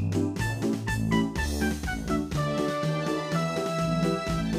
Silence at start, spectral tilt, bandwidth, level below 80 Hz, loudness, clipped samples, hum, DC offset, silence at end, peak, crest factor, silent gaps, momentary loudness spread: 0 s; -6 dB/octave; 15.5 kHz; -40 dBFS; -28 LUFS; under 0.1%; none; under 0.1%; 0 s; -12 dBFS; 14 dB; none; 3 LU